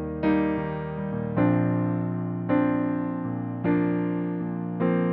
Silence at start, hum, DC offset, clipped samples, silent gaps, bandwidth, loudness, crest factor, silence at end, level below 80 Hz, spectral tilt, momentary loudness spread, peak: 0 s; none; under 0.1%; under 0.1%; none; 4.4 kHz; -26 LUFS; 14 dB; 0 s; -52 dBFS; -8.5 dB/octave; 7 LU; -10 dBFS